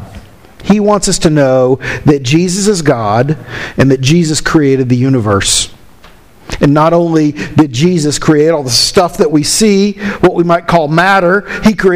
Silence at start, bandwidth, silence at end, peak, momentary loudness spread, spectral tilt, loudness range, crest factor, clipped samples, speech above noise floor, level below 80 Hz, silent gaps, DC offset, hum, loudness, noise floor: 0 s; 16 kHz; 0 s; 0 dBFS; 4 LU; -5 dB/octave; 2 LU; 10 dB; under 0.1%; 30 dB; -32 dBFS; none; 0.5%; none; -10 LUFS; -40 dBFS